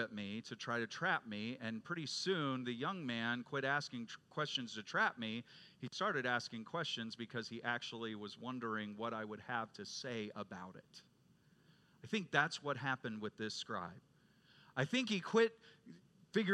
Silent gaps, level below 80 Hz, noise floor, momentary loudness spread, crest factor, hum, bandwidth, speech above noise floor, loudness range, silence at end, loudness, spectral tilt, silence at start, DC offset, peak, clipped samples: none; -88 dBFS; -71 dBFS; 11 LU; 26 dB; none; 11.5 kHz; 29 dB; 5 LU; 0 s; -41 LUFS; -4.5 dB/octave; 0 s; under 0.1%; -16 dBFS; under 0.1%